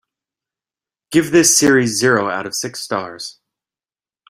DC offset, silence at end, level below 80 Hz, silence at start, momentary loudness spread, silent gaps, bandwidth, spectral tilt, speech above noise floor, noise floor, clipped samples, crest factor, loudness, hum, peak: under 0.1%; 1 s; -56 dBFS; 1.1 s; 16 LU; none; 16 kHz; -3 dB/octave; over 74 dB; under -90 dBFS; under 0.1%; 18 dB; -15 LUFS; none; 0 dBFS